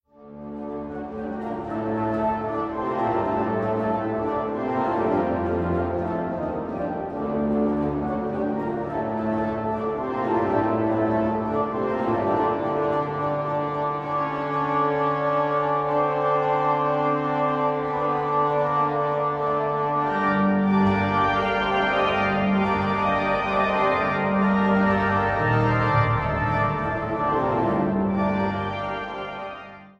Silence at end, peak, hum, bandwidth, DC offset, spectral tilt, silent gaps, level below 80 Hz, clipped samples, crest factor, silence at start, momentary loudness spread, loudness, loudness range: 0.1 s; -8 dBFS; none; 7.4 kHz; under 0.1%; -8.5 dB/octave; none; -46 dBFS; under 0.1%; 14 dB; 0.2 s; 8 LU; -24 LUFS; 4 LU